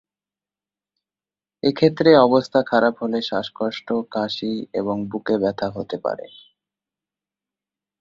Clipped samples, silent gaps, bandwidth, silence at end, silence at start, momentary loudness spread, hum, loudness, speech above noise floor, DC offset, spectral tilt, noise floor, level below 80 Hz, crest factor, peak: under 0.1%; none; 7.4 kHz; 1.75 s; 1.65 s; 13 LU; 50 Hz at -55 dBFS; -21 LUFS; over 70 dB; under 0.1%; -7 dB/octave; under -90 dBFS; -60 dBFS; 20 dB; -2 dBFS